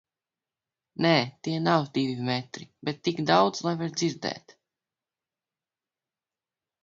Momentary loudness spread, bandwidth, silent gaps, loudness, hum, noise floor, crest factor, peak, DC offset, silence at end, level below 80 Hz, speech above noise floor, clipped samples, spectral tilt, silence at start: 13 LU; 7.6 kHz; none; -27 LUFS; none; under -90 dBFS; 24 dB; -6 dBFS; under 0.1%; 2.45 s; -70 dBFS; over 63 dB; under 0.1%; -5 dB/octave; 1 s